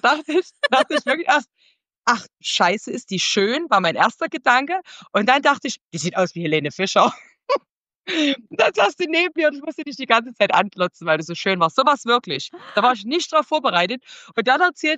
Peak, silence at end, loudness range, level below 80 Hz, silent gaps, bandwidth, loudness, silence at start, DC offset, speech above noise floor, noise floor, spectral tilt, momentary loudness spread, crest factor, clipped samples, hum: -2 dBFS; 0 s; 1 LU; -76 dBFS; 1.98-2.02 s, 5.81-5.89 s, 7.71-7.85 s, 7.96-8.00 s; 10 kHz; -19 LUFS; 0.05 s; under 0.1%; 38 dB; -58 dBFS; -3.5 dB/octave; 9 LU; 18 dB; under 0.1%; none